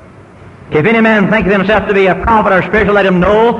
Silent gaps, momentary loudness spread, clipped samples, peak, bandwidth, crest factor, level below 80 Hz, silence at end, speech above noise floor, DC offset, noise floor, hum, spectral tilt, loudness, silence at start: none; 2 LU; under 0.1%; 0 dBFS; 8.2 kHz; 10 dB; -30 dBFS; 0 s; 26 dB; under 0.1%; -35 dBFS; none; -7.5 dB/octave; -10 LUFS; 0.45 s